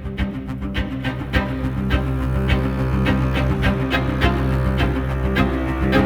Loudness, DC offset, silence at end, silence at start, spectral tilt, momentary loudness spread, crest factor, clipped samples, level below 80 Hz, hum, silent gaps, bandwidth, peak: -21 LUFS; under 0.1%; 0 s; 0 s; -7.5 dB/octave; 6 LU; 16 dB; under 0.1%; -24 dBFS; none; none; 16 kHz; -2 dBFS